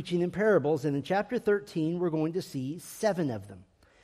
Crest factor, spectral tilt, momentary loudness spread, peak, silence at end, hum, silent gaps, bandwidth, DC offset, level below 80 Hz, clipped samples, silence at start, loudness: 16 dB; -6.5 dB/octave; 11 LU; -14 dBFS; 0.4 s; none; none; 15 kHz; under 0.1%; -66 dBFS; under 0.1%; 0 s; -29 LUFS